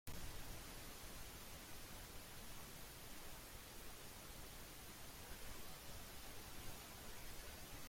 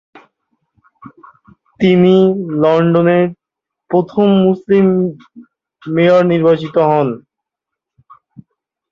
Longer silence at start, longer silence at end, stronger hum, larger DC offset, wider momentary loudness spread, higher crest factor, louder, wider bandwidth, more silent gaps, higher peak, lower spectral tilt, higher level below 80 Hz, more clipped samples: second, 0.05 s vs 1.05 s; second, 0 s vs 1.75 s; neither; neither; second, 2 LU vs 10 LU; first, 22 dB vs 14 dB; second, -55 LUFS vs -13 LUFS; first, 16.5 kHz vs 6.6 kHz; neither; second, -32 dBFS vs -2 dBFS; second, -2.5 dB/octave vs -9 dB/octave; about the same, -60 dBFS vs -56 dBFS; neither